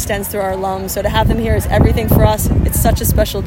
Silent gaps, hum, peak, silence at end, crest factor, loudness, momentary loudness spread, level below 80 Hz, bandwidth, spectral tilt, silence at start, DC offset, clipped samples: none; none; 0 dBFS; 0 s; 14 dB; -15 LUFS; 6 LU; -20 dBFS; 16.5 kHz; -5.5 dB/octave; 0 s; under 0.1%; under 0.1%